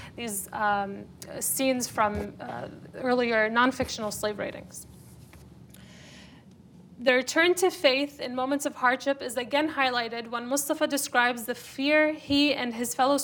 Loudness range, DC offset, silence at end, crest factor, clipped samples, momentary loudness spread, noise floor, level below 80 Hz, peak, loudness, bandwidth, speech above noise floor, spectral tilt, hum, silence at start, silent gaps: 5 LU; under 0.1%; 0 s; 20 dB; under 0.1%; 13 LU; -51 dBFS; -60 dBFS; -8 dBFS; -26 LUFS; over 20 kHz; 25 dB; -2.5 dB/octave; none; 0 s; none